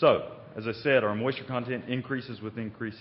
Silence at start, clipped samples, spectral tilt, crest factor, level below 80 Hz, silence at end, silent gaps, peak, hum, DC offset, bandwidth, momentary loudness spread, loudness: 0 s; under 0.1%; -10 dB/octave; 20 dB; -66 dBFS; 0 s; none; -10 dBFS; none; under 0.1%; 5.8 kHz; 12 LU; -30 LUFS